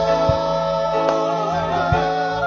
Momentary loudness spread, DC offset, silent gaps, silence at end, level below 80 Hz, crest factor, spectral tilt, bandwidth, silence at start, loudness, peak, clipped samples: 3 LU; under 0.1%; none; 0 s; -40 dBFS; 16 dB; -6 dB/octave; 7.4 kHz; 0 s; -19 LUFS; -4 dBFS; under 0.1%